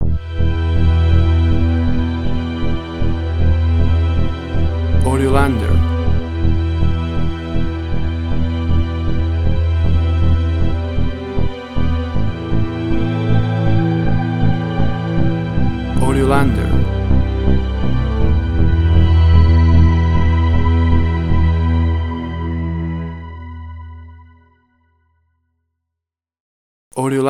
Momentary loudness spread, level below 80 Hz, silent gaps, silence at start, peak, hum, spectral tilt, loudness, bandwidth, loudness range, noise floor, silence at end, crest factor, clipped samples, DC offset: 8 LU; -22 dBFS; 26.40-26.91 s; 0 s; 0 dBFS; none; -8 dB/octave; -17 LUFS; 11 kHz; 6 LU; -83 dBFS; 0 s; 14 dB; under 0.1%; 6%